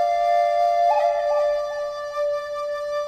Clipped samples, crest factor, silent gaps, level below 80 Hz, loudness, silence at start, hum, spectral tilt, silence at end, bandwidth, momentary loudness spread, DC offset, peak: under 0.1%; 12 dB; none; -58 dBFS; -22 LUFS; 0 s; none; -1.5 dB/octave; 0 s; 13.5 kHz; 9 LU; under 0.1%; -10 dBFS